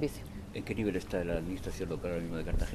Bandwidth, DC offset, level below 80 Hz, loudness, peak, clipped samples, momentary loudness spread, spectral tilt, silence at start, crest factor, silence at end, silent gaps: 13.5 kHz; under 0.1%; -42 dBFS; -37 LUFS; -18 dBFS; under 0.1%; 7 LU; -6.5 dB/octave; 0 s; 16 dB; 0 s; none